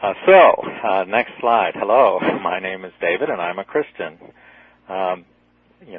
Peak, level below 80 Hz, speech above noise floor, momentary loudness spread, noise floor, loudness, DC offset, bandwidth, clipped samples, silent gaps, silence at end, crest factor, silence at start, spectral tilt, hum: 0 dBFS; -64 dBFS; 39 dB; 17 LU; -57 dBFS; -18 LUFS; under 0.1%; 4.1 kHz; under 0.1%; none; 0 s; 18 dB; 0 s; -9 dB/octave; 60 Hz at -60 dBFS